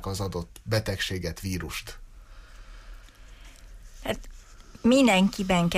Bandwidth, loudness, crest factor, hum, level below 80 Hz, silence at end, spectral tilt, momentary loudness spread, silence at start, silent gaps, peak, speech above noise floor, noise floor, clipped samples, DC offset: 15.5 kHz; -26 LUFS; 18 dB; none; -44 dBFS; 0 s; -5 dB/octave; 16 LU; 0 s; none; -10 dBFS; 22 dB; -47 dBFS; under 0.1%; under 0.1%